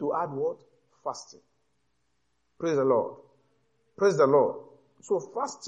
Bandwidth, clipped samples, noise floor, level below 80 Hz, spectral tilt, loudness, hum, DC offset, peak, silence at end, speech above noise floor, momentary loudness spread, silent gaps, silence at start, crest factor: 9.2 kHz; under 0.1%; -77 dBFS; -76 dBFS; -6 dB/octave; -27 LUFS; none; under 0.1%; -10 dBFS; 0 s; 50 dB; 17 LU; none; 0 s; 18 dB